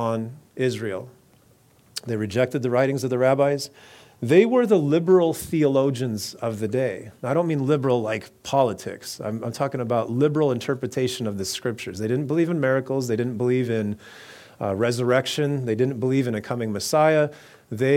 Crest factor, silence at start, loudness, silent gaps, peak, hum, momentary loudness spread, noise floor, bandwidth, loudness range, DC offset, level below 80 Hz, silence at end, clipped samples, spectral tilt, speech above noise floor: 20 dB; 0 s; -23 LUFS; none; -4 dBFS; none; 12 LU; -57 dBFS; 17 kHz; 4 LU; under 0.1%; -64 dBFS; 0 s; under 0.1%; -6 dB/octave; 34 dB